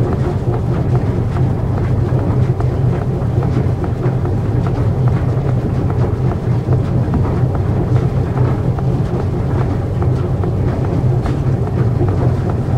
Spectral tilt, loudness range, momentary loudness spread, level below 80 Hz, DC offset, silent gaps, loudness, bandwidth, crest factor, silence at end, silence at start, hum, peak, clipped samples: -9.5 dB/octave; 1 LU; 2 LU; -26 dBFS; under 0.1%; none; -16 LUFS; 6.8 kHz; 12 dB; 0 s; 0 s; none; -2 dBFS; under 0.1%